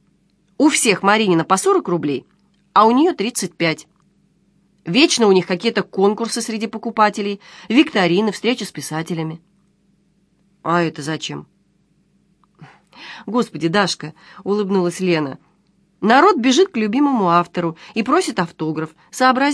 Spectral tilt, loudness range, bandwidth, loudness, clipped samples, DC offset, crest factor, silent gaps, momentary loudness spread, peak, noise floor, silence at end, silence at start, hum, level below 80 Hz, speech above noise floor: -4.5 dB/octave; 9 LU; 11 kHz; -17 LUFS; under 0.1%; under 0.1%; 18 dB; none; 14 LU; 0 dBFS; -60 dBFS; 0 s; 0.6 s; none; -66 dBFS; 43 dB